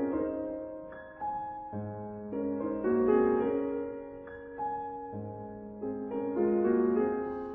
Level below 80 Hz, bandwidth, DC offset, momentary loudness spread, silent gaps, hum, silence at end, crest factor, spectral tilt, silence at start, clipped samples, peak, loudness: -60 dBFS; 3.6 kHz; under 0.1%; 16 LU; none; none; 0 s; 18 dB; -8.5 dB/octave; 0 s; under 0.1%; -14 dBFS; -32 LUFS